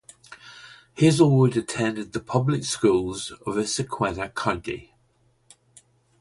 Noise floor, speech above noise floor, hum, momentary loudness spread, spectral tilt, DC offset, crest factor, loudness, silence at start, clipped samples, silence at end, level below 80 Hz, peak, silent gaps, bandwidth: -64 dBFS; 42 dB; none; 25 LU; -5.5 dB/octave; under 0.1%; 20 dB; -23 LUFS; 0.3 s; under 0.1%; 1.4 s; -52 dBFS; -4 dBFS; none; 11.5 kHz